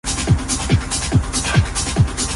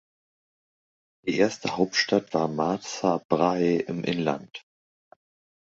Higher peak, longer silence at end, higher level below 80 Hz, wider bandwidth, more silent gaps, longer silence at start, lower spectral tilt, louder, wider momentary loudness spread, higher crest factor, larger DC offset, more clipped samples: first, -2 dBFS vs -6 dBFS; second, 0 s vs 1 s; first, -26 dBFS vs -64 dBFS; first, 11.5 kHz vs 8 kHz; second, none vs 3.25-3.29 s; second, 0.05 s vs 1.25 s; about the same, -4 dB/octave vs -5 dB/octave; first, -18 LUFS vs -26 LUFS; second, 1 LU vs 9 LU; second, 16 dB vs 22 dB; neither; neither